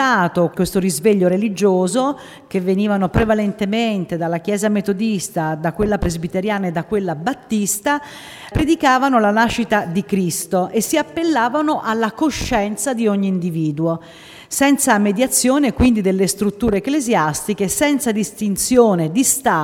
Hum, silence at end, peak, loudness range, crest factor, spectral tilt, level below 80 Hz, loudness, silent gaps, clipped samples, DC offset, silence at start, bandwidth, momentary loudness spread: none; 0 s; 0 dBFS; 4 LU; 16 dB; -4.5 dB/octave; -38 dBFS; -17 LUFS; none; under 0.1%; under 0.1%; 0 s; 17 kHz; 7 LU